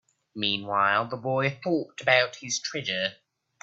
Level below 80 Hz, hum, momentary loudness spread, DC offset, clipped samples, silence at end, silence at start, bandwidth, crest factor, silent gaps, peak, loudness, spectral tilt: -70 dBFS; none; 7 LU; under 0.1%; under 0.1%; 0.5 s; 0.35 s; 8.4 kHz; 24 dB; none; -4 dBFS; -26 LUFS; -3 dB/octave